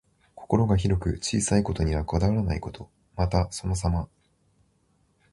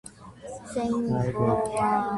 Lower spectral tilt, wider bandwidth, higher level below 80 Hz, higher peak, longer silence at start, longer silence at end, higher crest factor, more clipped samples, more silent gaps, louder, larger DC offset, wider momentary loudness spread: about the same, -6 dB/octave vs -7 dB/octave; about the same, 11.5 kHz vs 11.5 kHz; first, -36 dBFS vs -52 dBFS; first, -6 dBFS vs -10 dBFS; first, 0.35 s vs 0.05 s; first, 1.25 s vs 0 s; about the same, 20 dB vs 16 dB; neither; neither; about the same, -26 LUFS vs -26 LUFS; neither; second, 11 LU vs 17 LU